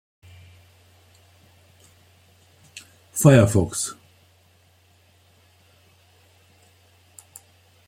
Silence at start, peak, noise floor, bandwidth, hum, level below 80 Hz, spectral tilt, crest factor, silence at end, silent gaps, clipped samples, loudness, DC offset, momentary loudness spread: 3.15 s; -2 dBFS; -58 dBFS; 16.5 kHz; none; -56 dBFS; -6 dB/octave; 24 dB; 3.95 s; none; under 0.1%; -19 LUFS; under 0.1%; 30 LU